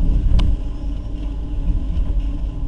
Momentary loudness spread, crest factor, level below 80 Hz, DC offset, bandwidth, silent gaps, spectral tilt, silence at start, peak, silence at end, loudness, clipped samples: 9 LU; 16 dB; -18 dBFS; under 0.1%; 5.6 kHz; none; -8 dB/octave; 0 s; -2 dBFS; 0 s; -24 LUFS; under 0.1%